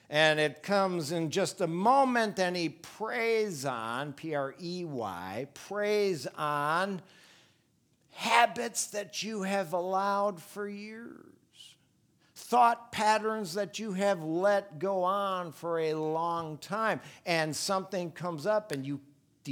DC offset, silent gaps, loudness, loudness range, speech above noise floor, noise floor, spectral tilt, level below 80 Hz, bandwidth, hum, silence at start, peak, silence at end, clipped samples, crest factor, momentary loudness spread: under 0.1%; none; -31 LUFS; 5 LU; 40 dB; -70 dBFS; -4 dB/octave; -80 dBFS; 19 kHz; none; 0.1 s; -8 dBFS; 0 s; under 0.1%; 22 dB; 13 LU